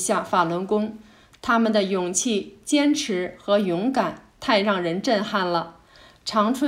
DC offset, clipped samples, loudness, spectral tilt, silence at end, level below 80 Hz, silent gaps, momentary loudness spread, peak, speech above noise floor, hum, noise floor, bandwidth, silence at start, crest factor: under 0.1%; under 0.1%; -23 LUFS; -4 dB/octave; 0 s; -60 dBFS; none; 8 LU; -6 dBFS; 29 dB; none; -51 dBFS; 15.5 kHz; 0 s; 16 dB